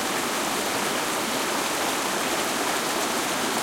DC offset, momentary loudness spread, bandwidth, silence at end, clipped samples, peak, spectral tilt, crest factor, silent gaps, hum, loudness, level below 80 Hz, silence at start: under 0.1%; 1 LU; 16.5 kHz; 0 s; under 0.1%; -12 dBFS; -1.5 dB/octave; 14 dB; none; none; -24 LUFS; -60 dBFS; 0 s